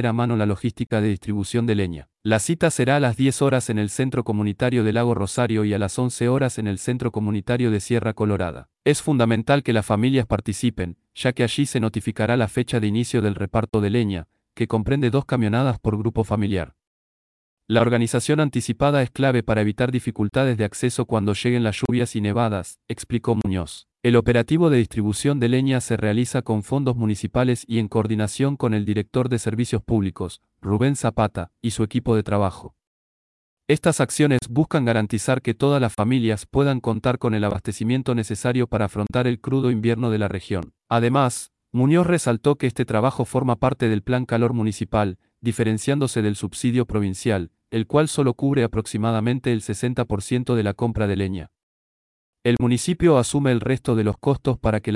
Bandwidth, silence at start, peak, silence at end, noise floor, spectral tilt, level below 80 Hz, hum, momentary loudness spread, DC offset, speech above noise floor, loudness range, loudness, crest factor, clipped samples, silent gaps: 12 kHz; 0 s; -6 dBFS; 0 s; under -90 dBFS; -6.5 dB/octave; -46 dBFS; none; 6 LU; under 0.1%; over 69 dB; 3 LU; -22 LUFS; 16 dB; under 0.1%; 16.87-17.57 s, 32.87-33.57 s, 51.63-52.33 s